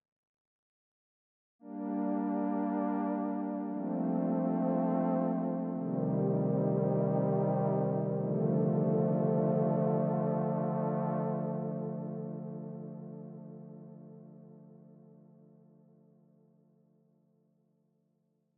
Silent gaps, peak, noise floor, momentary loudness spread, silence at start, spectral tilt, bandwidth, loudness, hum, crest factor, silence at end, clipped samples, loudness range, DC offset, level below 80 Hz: none; -18 dBFS; -76 dBFS; 16 LU; 1.65 s; -12 dB/octave; 3 kHz; -32 LUFS; none; 16 dB; 3.75 s; under 0.1%; 15 LU; under 0.1%; under -90 dBFS